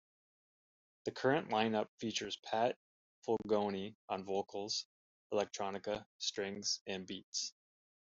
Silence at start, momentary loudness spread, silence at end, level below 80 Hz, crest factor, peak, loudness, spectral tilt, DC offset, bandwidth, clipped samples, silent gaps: 1.05 s; 10 LU; 0.7 s; -78 dBFS; 22 dB; -18 dBFS; -39 LUFS; -2.5 dB/octave; under 0.1%; 8 kHz; under 0.1%; 1.88-1.98 s, 2.39-2.43 s, 2.76-3.22 s, 3.95-4.08 s, 4.85-5.30 s, 6.06-6.19 s, 6.81-6.86 s, 7.24-7.32 s